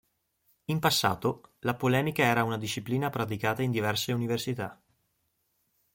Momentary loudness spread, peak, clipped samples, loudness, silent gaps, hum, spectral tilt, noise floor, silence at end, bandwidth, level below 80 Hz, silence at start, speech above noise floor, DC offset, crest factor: 9 LU; -10 dBFS; under 0.1%; -29 LUFS; none; none; -5 dB/octave; -76 dBFS; 1.2 s; 17 kHz; -64 dBFS; 0.7 s; 47 dB; under 0.1%; 20 dB